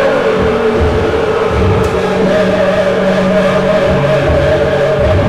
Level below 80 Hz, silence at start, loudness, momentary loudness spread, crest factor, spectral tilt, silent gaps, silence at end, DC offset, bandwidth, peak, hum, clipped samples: -24 dBFS; 0 s; -11 LUFS; 2 LU; 6 dB; -7 dB/octave; none; 0 s; under 0.1%; 13 kHz; -4 dBFS; none; under 0.1%